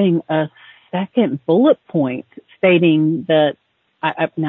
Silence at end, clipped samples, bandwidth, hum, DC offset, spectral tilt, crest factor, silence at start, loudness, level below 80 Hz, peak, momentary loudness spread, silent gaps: 0 s; under 0.1%; 4 kHz; none; under 0.1%; -10.5 dB/octave; 14 dB; 0 s; -17 LUFS; -66 dBFS; -2 dBFS; 11 LU; none